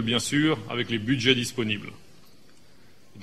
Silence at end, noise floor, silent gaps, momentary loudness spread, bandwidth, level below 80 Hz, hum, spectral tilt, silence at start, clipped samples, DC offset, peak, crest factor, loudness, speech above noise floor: 0 s; -57 dBFS; none; 8 LU; 14.5 kHz; -58 dBFS; none; -4 dB/octave; 0 s; under 0.1%; 0.4%; -4 dBFS; 24 dB; -25 LUFS; 31 dB